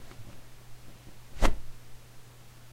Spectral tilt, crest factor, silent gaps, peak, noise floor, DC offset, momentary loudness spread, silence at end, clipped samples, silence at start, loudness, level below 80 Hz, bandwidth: -4.5 dB/octave; 24 dB; none; -6 dBFS; -50 dBFS; under 0.1%; 21 LU; 0.05 s; under 0.1%; 0 s; -34 LUFS; -34 dBFS; 14 kHz